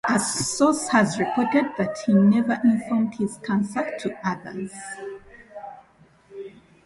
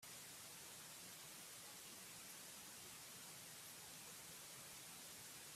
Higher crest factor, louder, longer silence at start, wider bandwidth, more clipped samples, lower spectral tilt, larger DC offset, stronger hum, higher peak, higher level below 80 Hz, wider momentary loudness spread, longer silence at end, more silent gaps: about the same, 16 dB vs 14 dB; first, -22 LUFS vs -55 LUFS; about the same, 0.05 s vs 0 s; second, 11.5 kHz vs 16 kHz; neither; first, -5 dB/octave vs -1 dB/octave; neither; neither; first, -6 dBFS vs -44 dBFS; first, -62 dBFS vs -86 dBFS; first, 21 LU vs 0 LU; first, 0.35 s vs 0 s; neither